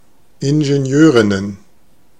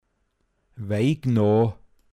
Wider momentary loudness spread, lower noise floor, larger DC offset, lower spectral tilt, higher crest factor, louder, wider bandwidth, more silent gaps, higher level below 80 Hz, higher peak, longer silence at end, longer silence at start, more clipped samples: first, 12 LU vs 9 LU; second, -55 dBFS vs -71 dBFS; first, 0.7% vs under 0.1%; second, -6.5 dB/octave vs -8.5 dB/octave; about the same, 14 dB vs 14 dB; first, -13 LUFS vs -23 LUFS; second, 9.6 kHz vs 11 kHz; neither; about the same, -54 dBFS vs -58 dBFS; first, 0 dBFS vs -10 dBFS; first, 0.65 s vs 0.4 s; second, 0.4 s vs 0.75 s; neither